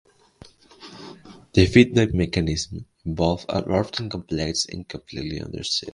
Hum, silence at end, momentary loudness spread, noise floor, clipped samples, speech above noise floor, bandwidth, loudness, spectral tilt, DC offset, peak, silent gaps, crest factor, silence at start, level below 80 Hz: none; 0.05 s; 20 LU; -50 dBFS; under 0.1%; 28 dB; 11 kHz; -23 LUFS; -5.5 dB/octave; under 0.1%; 0 dBFS; none; 24 dB; 0.8 s; -38 dBFS